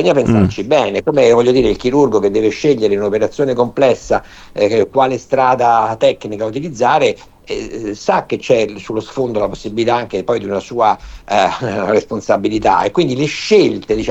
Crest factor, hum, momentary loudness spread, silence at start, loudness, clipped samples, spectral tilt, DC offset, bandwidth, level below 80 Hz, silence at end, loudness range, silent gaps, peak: 14 dB; none; 9 LU; 0 s; -15 LUFS; under 0.1%; -6 dB/octave; under 0.1%; 8.2 kHz; -40 dBFS; 0 s; 4 LU; none; 0 dBFS